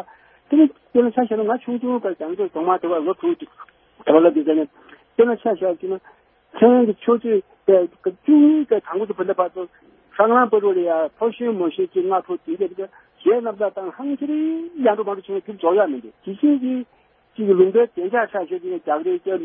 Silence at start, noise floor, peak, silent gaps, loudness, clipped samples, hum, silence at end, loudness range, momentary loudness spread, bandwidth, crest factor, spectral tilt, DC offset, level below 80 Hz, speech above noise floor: 0.5 s; -48 dBFS; 0 dBFS; none; -19 LUFS; under 0.1%; none; 0 s; 5 LU; 13 LU; 3.6 kHz; 18 dB; -11 dB/octave; under 0.1%; -70 dBFS; 29 dB